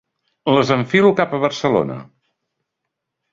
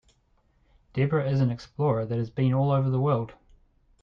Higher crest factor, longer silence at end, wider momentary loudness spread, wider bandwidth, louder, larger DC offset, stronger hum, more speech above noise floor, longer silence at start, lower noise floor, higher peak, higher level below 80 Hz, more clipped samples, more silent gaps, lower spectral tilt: about the same, 18 dB vs 14 dB; first, 1.3 s vs 0.7 s; first, 12 LU vs 6 LU; first, 7.6 kHz vs 6.4 kHz; first, -17 LUFS vs -26 LUFS; neither; neither; first, 63 dB vs 41 dB; second, 0.45 s vs 0.95 s; first, -79 dBFS vs -66 dBFS; first, -2 dBFS vs -12 dBFS; about the same, -58 dBFS vs -56 dBFS; neither; neither; second, -6 dB/octave vs -9.5 dB/octave